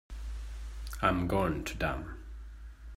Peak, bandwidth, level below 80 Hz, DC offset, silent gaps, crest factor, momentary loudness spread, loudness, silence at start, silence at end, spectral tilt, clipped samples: -12 dBFS; 16 kHz; -42 dBFS; under 0.1%; none; 22 dB; 19 LU; -34 LUFS; 0.1 s; 0 s; -6 dB/octave; under 0.1%